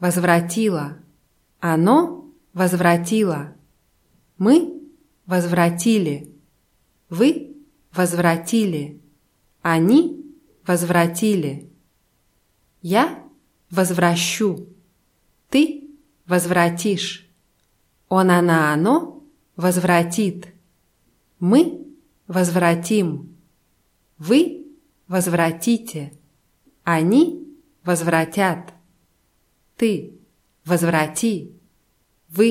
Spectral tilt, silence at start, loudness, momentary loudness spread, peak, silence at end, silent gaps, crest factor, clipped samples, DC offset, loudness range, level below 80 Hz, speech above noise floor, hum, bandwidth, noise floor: -5.5 dB/octave; 0 s; -19 LUFS; 17 LU; -2 dBFS; 0 s; none; 18 dB; under 0.1%; under 0.1%; 3 LU; -64 dBFS; 46 dB; none; 16 kHz; -64 dBFS